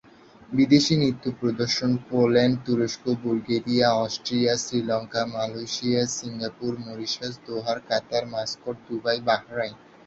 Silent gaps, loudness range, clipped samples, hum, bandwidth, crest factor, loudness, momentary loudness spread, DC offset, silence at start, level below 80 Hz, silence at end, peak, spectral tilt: none; 5 LU; under 0.1%; none; 8 kHz; 20 dB; -25 LUFS; 11 LU; under 0.1%; 0.5 s; -60 dBFS; 0.3 s; -6 dBFS; -5 dB/octave